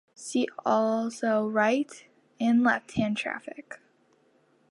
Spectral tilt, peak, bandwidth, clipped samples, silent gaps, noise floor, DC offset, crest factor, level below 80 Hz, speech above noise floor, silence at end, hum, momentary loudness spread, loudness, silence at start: -5 dB/octave; -10 dBFS; 11.5 kHz; under 0.1%; none; -65 dBFS; under 0.1%; 18 dB; -66 dBFS; 39 dB; 0.95 s; none; 16 LU; -27 LUFS; 0.2 s